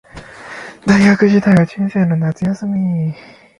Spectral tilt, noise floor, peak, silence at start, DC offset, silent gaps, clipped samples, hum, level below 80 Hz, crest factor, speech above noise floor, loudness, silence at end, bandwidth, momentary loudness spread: -7.5 dB/octave; -34 dBFS; 0 dBFS; 0.15 s; under 0.1%; none; under 0.1%; none; -46 dBFS; 14 dB; 21 dB; -14 LUFS; 0.4 s; 11 kHz; 20 LU